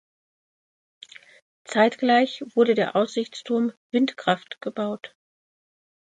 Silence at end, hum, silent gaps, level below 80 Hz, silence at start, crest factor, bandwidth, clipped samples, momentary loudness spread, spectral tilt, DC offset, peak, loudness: 1 s; none; 3.77-3.90 s; -76 dBFS; 1.7 s; 20 dB; 9.2 kHz; under 0.1%; 11 LU; -5 dB/octave; under 0.1%; -6 dBFS; -23 LUFS